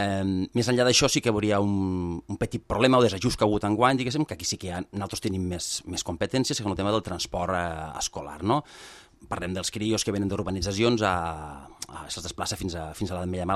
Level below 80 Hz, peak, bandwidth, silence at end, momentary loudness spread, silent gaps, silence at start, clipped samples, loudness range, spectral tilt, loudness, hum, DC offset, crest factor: -48 dBFS; -6 dBFS; 15 kHz; 0 s; 12 LU; none; 0 s; under 0.1%; 6 LU; -4.5 dB/octave; -26 LUFS; none; under 0.1%; 20 dB